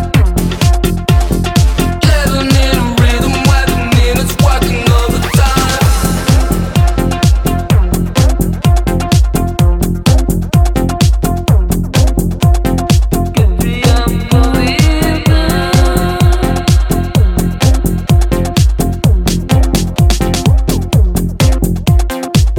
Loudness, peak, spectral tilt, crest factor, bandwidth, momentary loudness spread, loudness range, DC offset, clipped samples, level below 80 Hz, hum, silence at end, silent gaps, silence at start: -12 LUFS; 0 dBFS; -5.5 dB/octave; 10 dB; 17.5 kHz; 3 LU; 1 LU; under 0.1%; under 0.1%; -14 dBFS; none; 0 s; none; 0 s